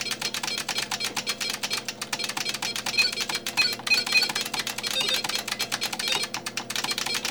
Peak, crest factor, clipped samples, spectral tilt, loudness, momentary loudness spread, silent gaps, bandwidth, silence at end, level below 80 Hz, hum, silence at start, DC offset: -8 dBFS; 20 dB; under 0.1%; 0 dB/octave; -25 LUFS; 7 LU; none; over 20 kHz; 0 s; -62 dBFS; 60 Hz at -50 dBFS; 0 s; 0.1%